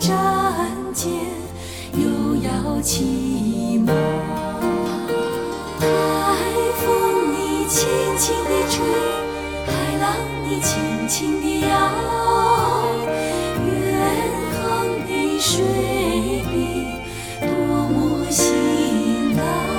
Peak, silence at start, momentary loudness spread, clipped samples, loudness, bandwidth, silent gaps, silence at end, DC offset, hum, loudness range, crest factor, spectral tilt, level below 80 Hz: -4 dBFS; 0 s; 6 LU; under 0.1%; -20 LUFS; 17.5 kHz; none; 0 s; under 0.1%; none; 2 LU; 16 dB; -4.5 dB/octave; -38 dBFS